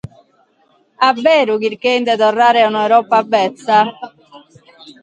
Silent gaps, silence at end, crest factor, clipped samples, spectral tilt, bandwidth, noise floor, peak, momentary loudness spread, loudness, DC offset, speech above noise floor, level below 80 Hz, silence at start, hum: none; 0.1 s; 14 dB; under 0.1%; -4.5 dB/octave; 9 kHz; -56 dBFS; 0 dBFS; 6 LU; -13 LUFS; under 0.1%; 43 dB; -60 dBFS; 1 s; none